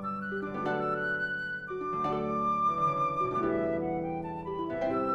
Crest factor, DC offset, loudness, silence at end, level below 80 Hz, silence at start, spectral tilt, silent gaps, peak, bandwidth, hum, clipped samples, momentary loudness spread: 14 dB; under 0.1%; -31 LUFS; 0 s; -60 dBFS; 0 s; -7.5 dB/octave; none; -18 dBFS; 8.6 kHz; none; under 0.1%; 7 LU